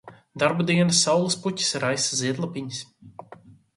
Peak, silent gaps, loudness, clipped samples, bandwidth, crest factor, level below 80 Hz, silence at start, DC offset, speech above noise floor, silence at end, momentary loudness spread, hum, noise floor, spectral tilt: -6 dBFS; none; -23 LUFS; under 0.1%; 11.5 kHz; 20 dB; -66 dBFS; 0.05 s; under 0.1%; 25 dB; 0.25 s; 16 LU; none; -49 dBFS; -3.5 dB/octave